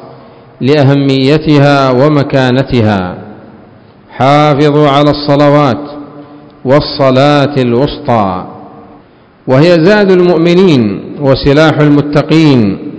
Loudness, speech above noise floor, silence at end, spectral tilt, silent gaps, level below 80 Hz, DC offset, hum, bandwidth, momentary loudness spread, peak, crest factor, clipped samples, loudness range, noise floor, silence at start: -8 LUFS; 33 dB; 0 s; -7.5 dB/octave; none; -36 dBFS; under 0.1%; none; 8 kHz; 9 LU; 0 dBFS; 8 dB; 5%; 3 LU; -40 dBFS; 0 s